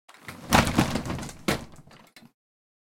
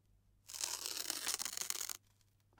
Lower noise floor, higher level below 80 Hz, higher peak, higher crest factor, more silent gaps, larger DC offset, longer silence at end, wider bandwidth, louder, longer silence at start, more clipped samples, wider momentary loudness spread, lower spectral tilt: second, -52 dBFS vs -73 dBFS; first, -42 dBFS vs -76 dBFS; first, -4 dBFS vs -14 dBFS; second, 26 dB vs 32 dB; neither; neither; first, 1.1 s vs 0.6 s; second, 17 kHz vs 19 kHz; first, -26 LUFS vs -40 LUFS; second, 0.25 s vs 0.45 s; neither; first, 22 LU vs 8 LU; first, -4.5 dB/octave vs 1.5 dB/octave